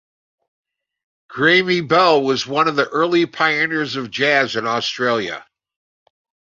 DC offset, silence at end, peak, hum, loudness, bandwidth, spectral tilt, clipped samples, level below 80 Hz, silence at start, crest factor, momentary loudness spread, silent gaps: under 0.1%; 1.1 s; -2 dBFS; none; -17 LUFS; 7.6 kHz; -4.5 dB/octave; under 0.1%; -62 dBFS; 1.3 s; 18 dB; 8 LU; none